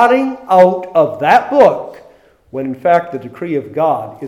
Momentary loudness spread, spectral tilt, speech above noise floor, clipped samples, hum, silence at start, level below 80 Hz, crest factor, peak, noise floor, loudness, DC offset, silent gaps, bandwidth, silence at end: 15 LU; -6.5 dB/octave; 33 dB; 0.2%; none; 0 s; -58 dBFS; 14 dB; 0 dBFS; -46 dBFS; -13 LUFS; under 0.1%; none; 14 kHz; 0 s